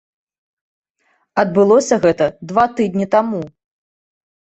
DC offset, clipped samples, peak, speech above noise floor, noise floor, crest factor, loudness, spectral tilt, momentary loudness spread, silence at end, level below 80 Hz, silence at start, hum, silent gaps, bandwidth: under 0.1%; under 0.1%; -2 dBFS; 49 dB; -64 dBFS; 16 dB; -16 LUFS; -6 dB/octave; 11 LU; 1.05 s; -56 dBFS; 1.35 s; none; none; 8.4 kHz